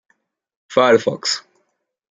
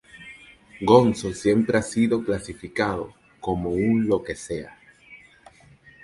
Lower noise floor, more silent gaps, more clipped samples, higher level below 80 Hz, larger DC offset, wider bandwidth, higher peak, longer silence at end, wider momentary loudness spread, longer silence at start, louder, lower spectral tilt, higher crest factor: first, -69 dBFS vs -52 dBFS; neither; neither; second, -66 dBFS vs -50 dBFS; neither; second, 9.6 kHz vs 11.5 kHz; about the same, -2 dBFS vs -2 dBFS; second, 0.7 s vs 0.9 s; second, 8 LU vs 20 LU; first, 0.7 s vs 0.15 s; first, -17 LUFS vs -23 LUFS; second, -3 dB/octave vs -6 dB/octave; about the same, 18 dB vs 22 dB